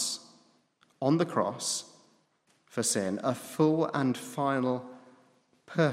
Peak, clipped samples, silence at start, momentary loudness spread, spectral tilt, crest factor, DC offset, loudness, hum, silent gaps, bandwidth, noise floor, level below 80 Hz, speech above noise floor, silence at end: -12 dBFS; under 0.1%; 0 s; 10 LU; -4.5 dB/octave; 18 dB; under 0.1%; -30 LUFS; none; none; 16 kHz; -70 dBFS; -80 dBFS; 41 dB; 0 s